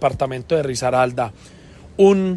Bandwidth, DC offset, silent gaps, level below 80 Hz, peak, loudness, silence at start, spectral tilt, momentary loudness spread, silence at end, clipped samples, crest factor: 12 kHz; under 0.1%; none; -46 dBFS; -4 dBFS; -19 LUFS; 0 s; -6 dB/octave; 12 LU; 0 s; under 0.1%; 16 dB